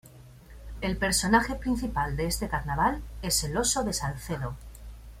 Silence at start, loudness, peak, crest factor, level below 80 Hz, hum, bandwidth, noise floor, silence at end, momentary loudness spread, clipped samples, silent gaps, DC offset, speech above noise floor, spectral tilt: 0.05 s; -28 LUFS; -8 dBFS; 20 dB; -40 dBFS; none; 16.5 kHz; -50 dBFS; 0 s; 17 LU; under 0.1%; none; under 0.1%; 22 dB; -3.5 dB/octave